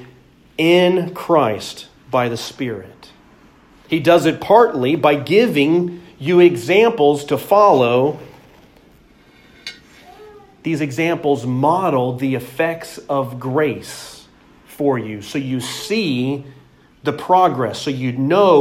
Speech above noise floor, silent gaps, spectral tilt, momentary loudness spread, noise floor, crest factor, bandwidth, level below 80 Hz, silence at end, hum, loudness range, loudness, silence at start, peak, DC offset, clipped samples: 33 dB; none; -6 dB/octave; 16 LU; -49 dBFS; 16 dB; 16 kHz; -56 dBFS; 0 s; none; 8 LU; -17 LUFS; 0 s; 0 dBFS; under 0.1%; under 0.1%